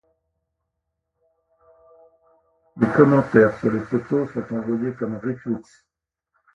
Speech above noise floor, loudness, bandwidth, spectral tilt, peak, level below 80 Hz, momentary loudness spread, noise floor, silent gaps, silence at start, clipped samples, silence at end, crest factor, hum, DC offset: 59 dB; -21 LUFS; 7.8 kHz; -9.5 dB/octave; 0 dBFS; -58 dBFS; 13 LU; -79 dBFS; none; 2.75 s; under 0.1%; 0.95 s; 22 dB; none; under 0.1%